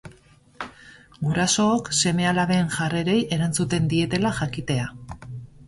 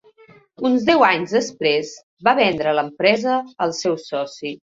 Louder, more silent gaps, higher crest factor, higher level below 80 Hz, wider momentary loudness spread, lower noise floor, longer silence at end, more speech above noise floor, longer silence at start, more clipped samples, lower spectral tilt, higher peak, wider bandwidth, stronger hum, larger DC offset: second, -22 LUFS vs -19 LUFS; second, none vs 2.03-2.17 s; about the same, 16 dB vs 18 dB; first, -48 dBFS vs -60 dBFS; first, 18 LU vs 11 LU; about the same, -53 dBFS vs -50 dBFS; second, 0 s vs 0.2 s; about the same, 31 dB vs 31 dB; second, 0.05 s vs 0.6 s; neither; about the same, -4.5 dB/octave vs -4 dB/octave; second, -8 dBFS vs -2 dBFS; first, 11.5 kHz vs 7.8 kHz; neither; neither